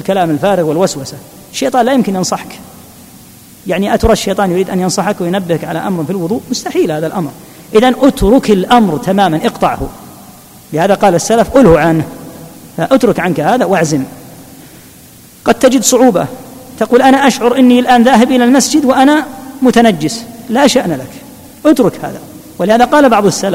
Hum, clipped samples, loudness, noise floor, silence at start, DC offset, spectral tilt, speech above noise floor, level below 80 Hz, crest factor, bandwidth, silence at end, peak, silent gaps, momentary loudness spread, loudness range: none; 0.7%; -10 LUFS; -37 dBFS; 0 s; under 0.1%; -5 dB/octave; 28 dB; -34 dBFS; 12 dB; 16.5 kHz; 0 s; 0 dBFS; none; 16 LU; 6 LU